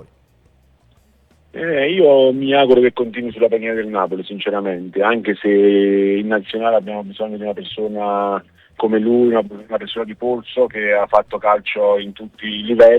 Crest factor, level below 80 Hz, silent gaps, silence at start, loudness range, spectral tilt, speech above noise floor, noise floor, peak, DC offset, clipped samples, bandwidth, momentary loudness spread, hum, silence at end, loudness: 16 dB; -56 dBFS; none; 1.55 s; 4 LU; -7.5 dB/octave; 38 dB; -54 dBFS; 0 dBFS; under 0.1%; under 0.1%; 5 kHz; 13 LU; none; 0 s; -17 LUFS